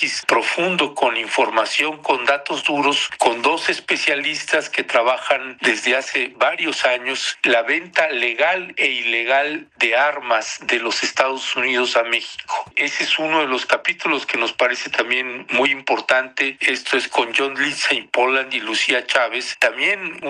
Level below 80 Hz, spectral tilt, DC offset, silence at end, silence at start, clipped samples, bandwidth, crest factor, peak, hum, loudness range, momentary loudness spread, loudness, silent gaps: -70 dBFS; -1.5 dB/octave; under 0.1%; 0 s; 0 s; under 0.1%; 13 kHz; 18 dB; -2 dBFS; none; 1 LU; 3 LU; -18 LUFS; none